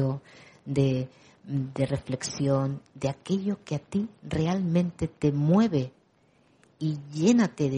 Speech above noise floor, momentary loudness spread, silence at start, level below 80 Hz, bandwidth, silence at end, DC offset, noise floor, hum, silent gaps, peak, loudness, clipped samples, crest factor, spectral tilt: 37 dB; 10 LU; 0 s; -56 dBFS; 10.5 kHz; 0 s; under 0.1%; -64 dBFS; none; none; -10 dBFS; -28 LUFS; under 0.1%; 18 dB; -7 dB/octave